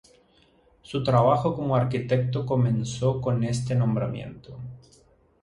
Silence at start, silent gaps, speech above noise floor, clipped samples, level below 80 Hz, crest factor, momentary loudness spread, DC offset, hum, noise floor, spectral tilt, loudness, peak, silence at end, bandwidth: 0.9 s; none; 36 dB; under 0.1%; -52 dBFS; 20 dB; 19 LU; under 0.1%; none; -60 dBFS; -7.5 dB/octave; -25 LUFS; -6 dBFS; 0.65 s; 11 kHz